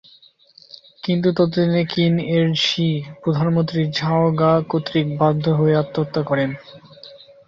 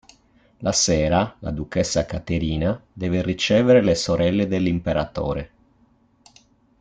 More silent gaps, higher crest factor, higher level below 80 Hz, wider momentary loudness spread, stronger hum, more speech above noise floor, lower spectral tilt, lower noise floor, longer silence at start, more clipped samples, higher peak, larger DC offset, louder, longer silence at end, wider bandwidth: neither; about the same, 16 dB vs 18 dB; second, -56 dBFS vs -42 dBFS; second, 6 LU vs 11 LU; neither; second, 33 dB vs 39 dB; first, -7 dB/octave vs -5 dB/octave; second, -51 dBFS vs -59 dBFS; first, 1.05 s vs 0.6 s; neither; about the same, -4 dBFS vs -4 dBFS; neither; about the same, -19 LUFS vs -21 LUFS; second, 0.3 s vs 1.35 s; second, 7.4 kHz vs 9.4 kHz